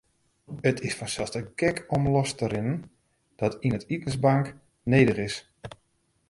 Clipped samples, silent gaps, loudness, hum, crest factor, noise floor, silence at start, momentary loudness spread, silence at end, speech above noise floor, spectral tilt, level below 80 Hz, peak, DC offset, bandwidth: under 0.1%; none; -27 LUFS; none; 22 dB; -51 dBFS; 0.5 s; 14 LU; 0.6 s; 25 dB; -6 dB/octave; -54 dBFS; -6 dBFS; under 0.1%; 11.5 kHz